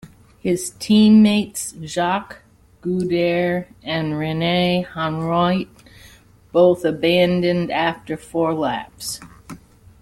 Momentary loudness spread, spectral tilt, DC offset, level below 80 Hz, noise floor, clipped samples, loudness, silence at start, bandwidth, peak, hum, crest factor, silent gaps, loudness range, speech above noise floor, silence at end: 14 LU; -5.5 dB/octave; under 0.1%; -52 dBFS; -48 dBFS; under 0.1%; -19 LUFS; 0.05 s; 14.5 kHz; -2 dBFS; none; 16 dB; none; 4 LU; 29 dB; 0.45 s